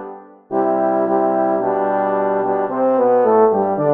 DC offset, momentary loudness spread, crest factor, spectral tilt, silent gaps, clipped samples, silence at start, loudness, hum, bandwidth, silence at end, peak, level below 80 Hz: under 0.1%; 5 LU; 14 dB; -10.5 dB/octave; none; under 0.1%; 0 s; -17 LUFS; none; 3.7 kHz; 0 s; -2 dBFS; -66 dBFS